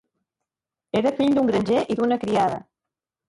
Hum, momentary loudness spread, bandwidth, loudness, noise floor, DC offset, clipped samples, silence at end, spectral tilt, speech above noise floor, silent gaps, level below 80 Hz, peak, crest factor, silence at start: none; 5 LU; 11.5 kHz; -22 LUFS; -88 dBFS; under 0.1%; under 0.1%; 0.7 s; -6.5 dB/octave; 67 dB; none; -58 dBFS; -10 dBFS; 14 dB; 0.95 s